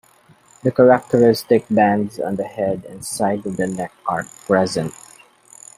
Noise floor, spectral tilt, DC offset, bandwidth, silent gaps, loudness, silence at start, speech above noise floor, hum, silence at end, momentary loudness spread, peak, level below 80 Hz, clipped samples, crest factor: -52 dBFS; -6 dB/octave; under 0.1%; 15.5 kHz; none; -19 LUFS; 0.65 s; 34 dB; none; 0.85 s; 12 LU; -2 dBFS; -58 dBFS; under 0.1%; 18 dB